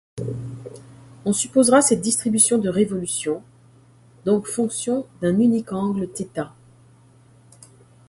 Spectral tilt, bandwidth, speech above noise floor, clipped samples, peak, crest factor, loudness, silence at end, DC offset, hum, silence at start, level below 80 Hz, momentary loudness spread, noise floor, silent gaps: -4.5 dB/octave; 12 kHz; 32 dB; under 0.1%; -2 dBFS; 20 dB; -21 LUFS; 1.6 s; under 0.1%; none; 0.15 s; -58 dBFS; 15 LU; -52 dBFS; none